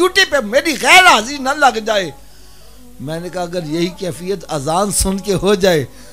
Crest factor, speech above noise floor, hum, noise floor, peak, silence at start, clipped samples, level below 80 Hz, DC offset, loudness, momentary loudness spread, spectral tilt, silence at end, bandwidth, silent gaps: 16 dB; 28 dB; none; -42 dBFS; 0 dBFS; 0 s; under 0.1%; -36 dBFS; 1%; -14 LUFS; 17 LU; -3 dB/octave; 0.1 s; 16 kHz; none